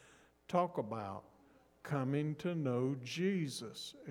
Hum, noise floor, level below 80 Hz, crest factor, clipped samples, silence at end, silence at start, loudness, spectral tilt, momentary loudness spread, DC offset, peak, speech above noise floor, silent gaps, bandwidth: none; -67 dBFS; -78 dBFS; 20 dB; under 0.1%; 0 s; 0.5 s; -38 LUFS; -6.5 dB/octave; 11 LU; under 0.1%; -20 dBFS; 29 dB; none; 17 kHz